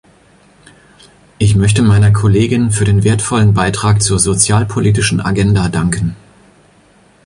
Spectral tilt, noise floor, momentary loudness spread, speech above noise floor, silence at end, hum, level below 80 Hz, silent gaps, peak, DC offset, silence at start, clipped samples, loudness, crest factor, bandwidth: -5 dB/octave; -48 dBFS; 5 LU; 37 dB; 1.1 s; none; -32 dBFS; none; 0 dBFS; under 0.1%; 1.4 s; under 0.1%; -12 LUFS; 12 dB; 11.5 kHz